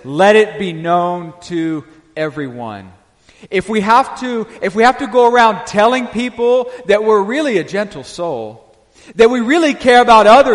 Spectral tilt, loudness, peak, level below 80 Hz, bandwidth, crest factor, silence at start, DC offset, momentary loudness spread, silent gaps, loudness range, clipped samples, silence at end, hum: -5 dB/octave; -13 LUFS; 0 dBFS; -48 dBFS; 11.5 kHz; 14 dB; 0.05 s; under 0.1%; 15 LU; none; 6 LU; under 0.1%; 0 s; none